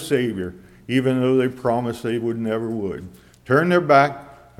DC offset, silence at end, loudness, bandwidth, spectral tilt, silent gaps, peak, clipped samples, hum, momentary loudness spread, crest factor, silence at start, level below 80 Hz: under 0.1%; 0.25 s; -20 LUFS; 15.5 kHz; -7 dB/octave; none; -2 dBFS; under 0.1%; none; 14 LU; 18 dB; 0 s; -56 dBFS